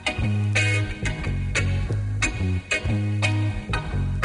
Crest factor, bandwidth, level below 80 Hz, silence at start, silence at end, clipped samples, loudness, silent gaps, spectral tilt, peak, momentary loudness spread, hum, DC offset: 14 dB; 11 kHz; -34 dBFS; 0 s; 0 s; under 0.1%; -24 LUFS; none; -5 dB/octave; -10 dBFS; 6 LU; none; under 0.1%